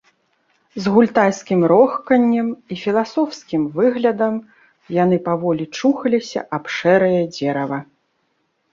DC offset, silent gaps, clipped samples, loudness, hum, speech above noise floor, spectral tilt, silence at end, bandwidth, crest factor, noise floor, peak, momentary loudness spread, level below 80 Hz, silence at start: under 0.1%; none; under 0.1%; -18 LUFS; none; 50 dB; -6.5 dB/octave; 0.9 s; 7.4 kHz; 16 dB; -67 dBFS; -2 dBFS; 10 LU; -62 dBFS; 0.75 s